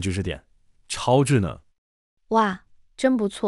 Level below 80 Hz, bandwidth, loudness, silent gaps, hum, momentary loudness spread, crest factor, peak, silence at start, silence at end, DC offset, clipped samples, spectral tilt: -48 dBFS; 12 kHz; -23 LUFS; 1.78-2.17 s; none; 17 LU; 18 dB; -6 dBFS; 0 s; 0 s; under 0.1%; under 0.1%; -6 dB/octave